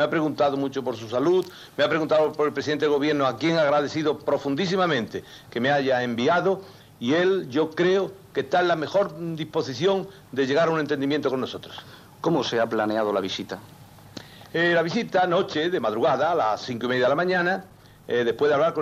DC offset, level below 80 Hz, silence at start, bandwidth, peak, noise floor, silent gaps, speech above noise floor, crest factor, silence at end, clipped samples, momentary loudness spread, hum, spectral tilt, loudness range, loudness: under 0.1%; -64 dBFS; 0 s; 15 kHz; -12 dBFS; -44 dBFS; none; 20 dB; 12 dB; 0 s; under 0.1%; 10 LU; none; -5.5 dB/octave; 3 LU; -24 LUFS